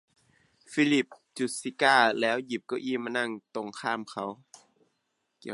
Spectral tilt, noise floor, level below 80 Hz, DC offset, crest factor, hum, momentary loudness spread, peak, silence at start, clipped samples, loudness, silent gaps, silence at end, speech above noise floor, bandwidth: -3.5 dB/octave; -78 dBFS; -82 dBFS; under 0.1%; 24 dB; none; 15 LU; -6 dBFS; 0.7 s; under 0.1%; -28 LUFS; none; 0 s; 50 dB; 11.5 kHz